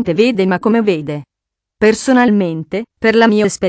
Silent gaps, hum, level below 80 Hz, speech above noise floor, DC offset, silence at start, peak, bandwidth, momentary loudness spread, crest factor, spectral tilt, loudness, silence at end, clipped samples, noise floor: none; none; -50 dBFS; 68 dB; under 0.1%; 0 s; 0 dBFS; 8 kHz; 11 LU; 14 dB; -5.5 dB/octave; -13 LUFS; 0 s; under 0.1%; -81 dBFS